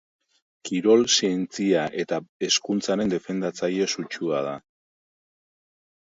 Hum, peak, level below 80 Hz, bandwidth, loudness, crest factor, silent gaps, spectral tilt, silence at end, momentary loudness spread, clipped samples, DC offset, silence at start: none; -6 dBFS; -66 dBFS; 8 kHz; -24 LUFS; 20 dB; 2.29-2.40 s; -3.5 dB/octave; 1.45 s; 10 LU; under 0.1%; under 0.1%; 0.65 s